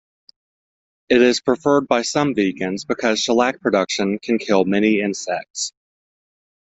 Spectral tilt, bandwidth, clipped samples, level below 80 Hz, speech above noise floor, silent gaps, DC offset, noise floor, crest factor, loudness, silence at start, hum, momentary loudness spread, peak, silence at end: -4 dB/octave; 8.4 kHz; under 0.1%; -60 dBFS; over 72 dB; 5.50-5.54 s; under 0.1%; under -90 dBFS; 18 dB; -19 LUFS; 1.1 s; none; 9 LU; 0 dBFS; 1.05 s